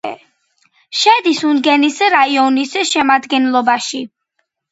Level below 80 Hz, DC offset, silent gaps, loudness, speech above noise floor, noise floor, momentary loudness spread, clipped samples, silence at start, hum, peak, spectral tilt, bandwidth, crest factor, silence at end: -64 dBFS; under 0.1%; none; -13 LUFS; 56 dB; -69 dBFS; 11 LU; under 0.1%; 0.05 s; none; 0 dBFS; -1.5 dB/octave; 8.2 kHz; 14 dB; 0.65 s